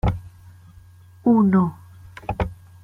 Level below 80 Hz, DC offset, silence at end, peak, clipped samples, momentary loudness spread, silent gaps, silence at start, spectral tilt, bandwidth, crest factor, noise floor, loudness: -38 dBFS; under 0.1%; 0.3 s; -6 dBFS; under 0.1%; 18 LU; none; 0.05 s; -10 dB/octave; 5.2 kHz; 16 dB; -47 dBFS; -21 LUFS